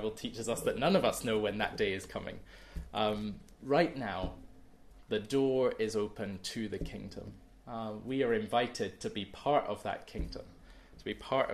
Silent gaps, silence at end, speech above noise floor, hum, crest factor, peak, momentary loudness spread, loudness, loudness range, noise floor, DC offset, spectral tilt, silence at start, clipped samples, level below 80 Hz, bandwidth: none; 0 s; 21 dB; none; 22 dB; -14 dBFS; 16 LU; -34 LUFS; 3 LU; -55 dBFS; under 0.1%; -5 dB/octave; 0 s; under 0.1%; -52 dBFS; 13.5 kHz